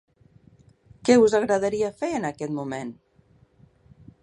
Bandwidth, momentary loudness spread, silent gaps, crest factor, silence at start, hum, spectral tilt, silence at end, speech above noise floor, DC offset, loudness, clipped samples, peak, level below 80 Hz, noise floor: 11 kHz; 15 LU; none; 20 dB; 1.05 s; none; -5 dB/octave; 1.3 s; 37 dB; under 0.1%; -23 LUFS; under 0.1%; -4 dBFS; -60 dBFS; -59 dBFS